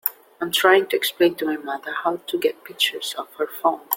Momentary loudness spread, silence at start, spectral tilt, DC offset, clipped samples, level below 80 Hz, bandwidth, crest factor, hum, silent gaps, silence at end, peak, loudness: 12 LU; 0.05 s; -2 dB/octave; under 0.1%; under 0.1%; -72 dBFS; 17 kHz; 22 dB; none; none; 0 s; 0 dBFS; -22 LUFS